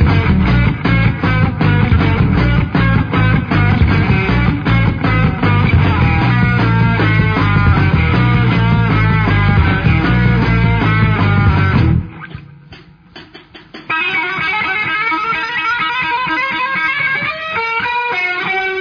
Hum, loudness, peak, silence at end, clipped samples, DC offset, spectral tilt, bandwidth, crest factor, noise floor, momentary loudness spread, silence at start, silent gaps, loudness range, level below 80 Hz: none; -13 LUFS; 0 dBFS; 0 s; under 0.1%; under 0.1%; -8.5 dB/octave; 5.4 kHz; 12 dB; -39 dBFS; 4 LU; 0 s; none; 4 LU; -24 dBFS